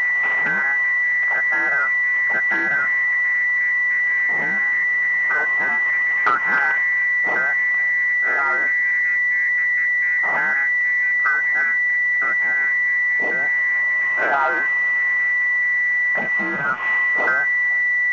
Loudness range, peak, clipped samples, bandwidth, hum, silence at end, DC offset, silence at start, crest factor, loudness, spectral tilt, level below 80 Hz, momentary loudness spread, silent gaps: 0 LU; -6 dBFS; under 0.1%; 7.2 kHz; none; 0 s; 0.1%; 0 s; 14 dB; -17 LUFS; -3.5 dB/octave; -70 dBFS; 1 LU; none